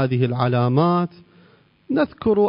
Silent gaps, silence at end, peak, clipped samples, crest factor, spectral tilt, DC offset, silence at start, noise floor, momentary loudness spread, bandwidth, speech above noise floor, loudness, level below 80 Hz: none; 0 s; -4 dBFS; under 0.1%; 16 dB; -12.5 dB/octave; under 0.1%; 0 s; -54 dBFS; 6 LU; 5.4 kHz; 35 dB; -20 LUFS; -54 dBFS